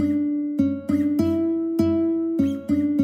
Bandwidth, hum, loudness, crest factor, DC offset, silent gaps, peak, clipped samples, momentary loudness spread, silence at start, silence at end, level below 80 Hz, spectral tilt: 14.5 kHz; none; -22 LUFS; 14 dB; under 0.1%; none; -8 dBFS; under 0.1%; 3 LU; 0 s; 0 s; -54 dBFS; -8.5 dB/octave